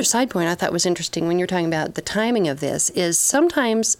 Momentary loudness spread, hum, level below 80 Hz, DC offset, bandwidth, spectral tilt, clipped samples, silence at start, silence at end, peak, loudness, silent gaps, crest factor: 6 LU; none; -56 dBFS; under 0.1%; 17 kHz; -3 dB/octave; under 0.1%; 0 s; 0.05 s; -6 dBFS; -20 LUFS; none; 14 dB